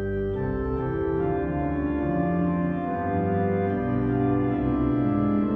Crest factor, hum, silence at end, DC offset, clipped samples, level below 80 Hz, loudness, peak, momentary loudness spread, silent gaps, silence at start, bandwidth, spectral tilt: 12 dB; none; 0 s; under 0.1%; under 0.1%; -40 dBFS; -25 LUFS; -12 dBFS; 4 LU; none; 0 s; 3.7 kHz; -11.5 dB/octave